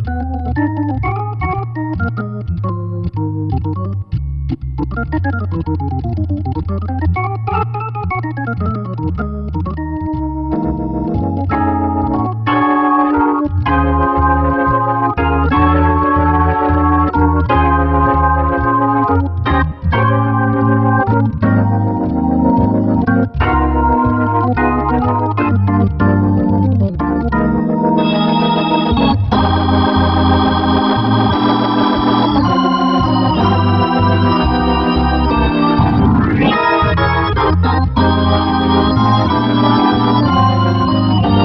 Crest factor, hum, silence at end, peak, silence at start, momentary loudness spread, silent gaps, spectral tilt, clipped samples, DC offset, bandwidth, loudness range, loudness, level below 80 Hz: 14 dB; none; 0 s; 0 dBFS; 0 s; 8 LU; none; -9.5 dB/octave; under 0.1%; under 0.1%; 6 kHz; 7 LU; -14 LUFS; -24 dBFS